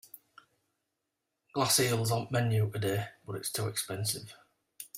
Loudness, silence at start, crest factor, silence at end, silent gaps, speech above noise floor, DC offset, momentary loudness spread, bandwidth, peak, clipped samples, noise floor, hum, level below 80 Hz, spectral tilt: -31 LUFS; 0.15 s; 22 dB; 0 s; none; 54 dB; under 0.1%; 14 LU; 16 kHz; -12 dBFS; under 0.1%; -85 dBFS; none; -68 dBFS; -4 dB/octave